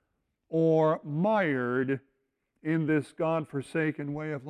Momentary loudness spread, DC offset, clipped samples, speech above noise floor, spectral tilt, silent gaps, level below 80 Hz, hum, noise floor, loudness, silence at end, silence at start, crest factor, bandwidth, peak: 9 LU; under 0.1%; under 0.1%; 51 dB; -8.5 dB/octave; none; -72 dBFS; none; -79 dBFS; -29 LUFS; 0 s; 0.5 s; 16 dB; 11 kHz; -14 dBFS